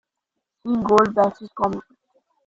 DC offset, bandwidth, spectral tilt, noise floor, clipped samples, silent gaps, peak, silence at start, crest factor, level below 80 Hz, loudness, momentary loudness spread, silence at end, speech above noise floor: under 0.1%; 7.8 kHz; -6.5 dB/octave; -81 dBFS; under 0.1%; none; -2 dBFS; 0.65 s; 20 dB; -56 dBFS; -20 LUFS; 14 LU; 0.65 s; 62 dB